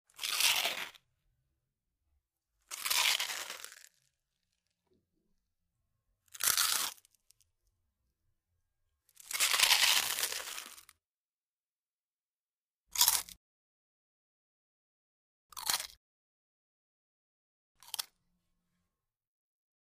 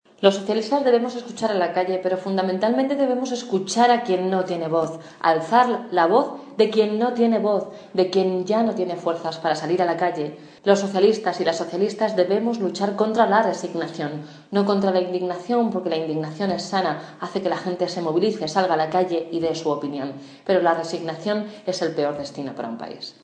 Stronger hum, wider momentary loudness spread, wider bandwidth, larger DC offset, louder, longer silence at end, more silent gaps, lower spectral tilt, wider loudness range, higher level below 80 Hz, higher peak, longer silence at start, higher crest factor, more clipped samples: neither; first, 21 LU vs 10 LU; first, 16 kHz vs 9.8 kHz; neither; second, -30 LUFS vs -22 LUFS; first, 1.95 s vs 0.15 s; first, 11.06-12.84 s, 13.37-15.49 s, 15.97-17.75 s vs none; second, 3 dB/octave vs -5.5 dB/octave; first, 11 LU vs 4 LU; second, -76 dBFS vs -70 dBFS; second, -10 dBFS vs -2 dBFS; about the same, 0.2 s vs 0.2 s; first, 28 dB vs 20 dB; neither